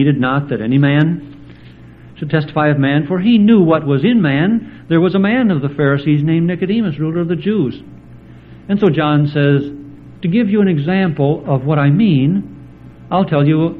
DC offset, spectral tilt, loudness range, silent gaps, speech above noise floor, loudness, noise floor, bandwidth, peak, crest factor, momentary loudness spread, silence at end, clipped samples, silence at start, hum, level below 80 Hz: under 0.1%; -10.5 dB/octave; 4 LU; none; 25 dB; -14 LUFS; -38 dBFS; 4.6 kHz; 0 dBFS; 14 dB; 7 LU; 0 s; under 0.1%; 0 s; none; -48 dBFS